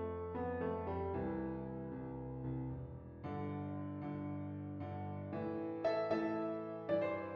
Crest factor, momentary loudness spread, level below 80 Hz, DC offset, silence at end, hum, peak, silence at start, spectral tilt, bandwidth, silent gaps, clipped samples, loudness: 16 dB; 8 LU; -62 dBFS; under 0.1%; 0 s; none; -26 dBFS; 0 s; -7.5 dB/octave; 6.6 kHz; none; under 0.1%; -42 LUFS